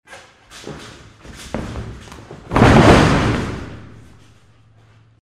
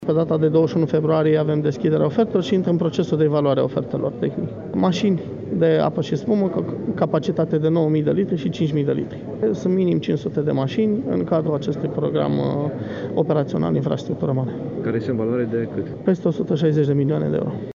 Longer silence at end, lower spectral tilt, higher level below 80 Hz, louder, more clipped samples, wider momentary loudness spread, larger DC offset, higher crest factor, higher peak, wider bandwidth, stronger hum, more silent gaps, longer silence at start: first, 1.35 s vs 0 s; second, -6 dB/octave vs -8.5 dB/octave; first, -30 dBFS vs -56 dBFS; first, -14 LUFS vs -21 LUFS; neither; first, 27 LU vs 7 LU; neither; about the same, 18 dB vs 16 dB; first, 0 dBFS vs -4 dBFS; first, 14 kHz vs 7.2 kHz; neither; neither; about the same, 0.1 s vs 0 s